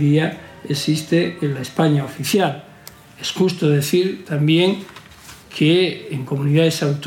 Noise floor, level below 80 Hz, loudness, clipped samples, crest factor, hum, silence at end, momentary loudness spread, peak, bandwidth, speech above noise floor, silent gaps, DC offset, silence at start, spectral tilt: -42 dBFS; -60 dBFS; -19 LUFS; under 0.1%; 16 dB; none; 0 s; 12 LU; -4 dBFS; 17 kHz; 25 dB; none; under 0.1%; 0 s; -6 dB/octave